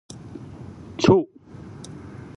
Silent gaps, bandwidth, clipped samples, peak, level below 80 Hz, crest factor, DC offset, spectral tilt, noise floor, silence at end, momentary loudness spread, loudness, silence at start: none; 11 kHz; under 0.1%; -2 dBFS; -50 dBFS; 22 dB; under 0.1%; -6.5 dB/octave; -41 dBFS; 0.1 s; 22 LU; -19 LUFS; 0.15 s